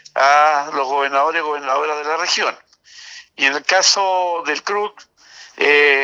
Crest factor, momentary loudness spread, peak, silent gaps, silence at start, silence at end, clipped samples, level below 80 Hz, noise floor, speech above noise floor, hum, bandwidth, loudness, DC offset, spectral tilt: 16 dB; 10 LU; -2 dBFS; none; 0.15 s; 0 s; under 0.1%; -74 dBFS; -40 dBFS; 23 dB; none; 10.5 kHz; -16 LUFS; under 0.1%; 0.5 dB/octave